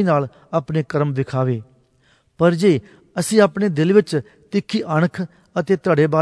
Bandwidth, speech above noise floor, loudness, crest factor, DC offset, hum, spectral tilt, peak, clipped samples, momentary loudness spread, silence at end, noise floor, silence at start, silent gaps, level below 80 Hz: 11 kHz; 41 dB; -19 LUFS; 18 dB; under 0.1%; none; -6.5 dB/octave; 0 dBFS; under 0.1%; 10 LU; 0 s; -59 dBFS; 0 s; none; -58 dBFS